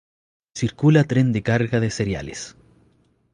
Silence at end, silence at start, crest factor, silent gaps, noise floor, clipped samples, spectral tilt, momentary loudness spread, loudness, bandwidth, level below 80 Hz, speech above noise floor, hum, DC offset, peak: 0.85 s; 0.55 s; 18 dB; none; -61 dBFS; under 0.1%; -6.5 dB/octave; 17 LU; -20 LUFS; 10.5 kHz; -48 dBFS; 41 dB; none; under 0.1%; -4 dBFS